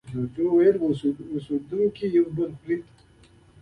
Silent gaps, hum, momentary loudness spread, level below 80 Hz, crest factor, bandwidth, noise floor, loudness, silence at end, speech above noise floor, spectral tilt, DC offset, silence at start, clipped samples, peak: none; none; 11 LU; -58 dBFS; 16 dB; 8.8 kHz; -55 dBFS; -24 LUFS; 0.8 s; 31 dB; -9 dB/octave; under 0.1%; 0.05 s; under 0.1%; -8 dBFS